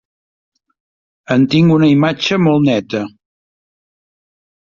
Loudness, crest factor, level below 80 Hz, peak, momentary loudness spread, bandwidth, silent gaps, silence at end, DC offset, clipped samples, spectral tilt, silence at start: -13 LUFS; 16 dB; -54 dBFS; 0 dBFS; 12 LU; 7.4 kHz; none; 1.6 s; under 0.1%; under 0.1%; -7 dB/octave; 1.3 s